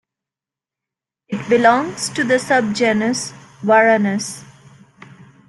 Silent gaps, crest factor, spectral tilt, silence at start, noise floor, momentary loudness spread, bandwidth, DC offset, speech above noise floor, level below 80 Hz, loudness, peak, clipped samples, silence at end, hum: none; 18 dB; -4 dB/octave; 1.3 s; -88 dBFS; 15 LU; 12.5 kHz; under 0.1%; 72 dB; -62 dBFS; -16 LUFS; -2 dBFS; under 0.1%; 1.05 s; none